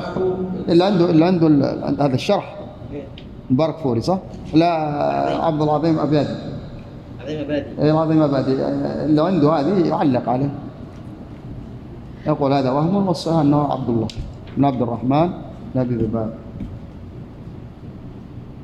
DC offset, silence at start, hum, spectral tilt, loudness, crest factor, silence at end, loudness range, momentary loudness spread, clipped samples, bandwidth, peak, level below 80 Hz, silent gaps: under 0.1%; 0 s; none; -8 dB/octave; -19 LUFS; 16 dB; 0 s; 4 LU; 20 LU; under 0.1%; 10 kHz; -2 dBFS; -44 dBFS; none